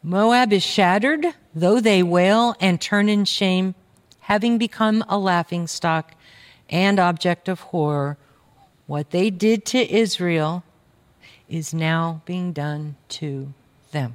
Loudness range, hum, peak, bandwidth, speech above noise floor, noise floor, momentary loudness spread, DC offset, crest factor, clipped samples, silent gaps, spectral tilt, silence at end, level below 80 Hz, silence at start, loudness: 7 LU; none; -4 dBFS; 15.5 kHz; 38 dB; -57 dBFS; 14 LU; under 0.1%; 16 dB; under 0.1%; none; -5.5 dB/octave; 0 s; -64 dBFS; 0.05 s; -20 LUFS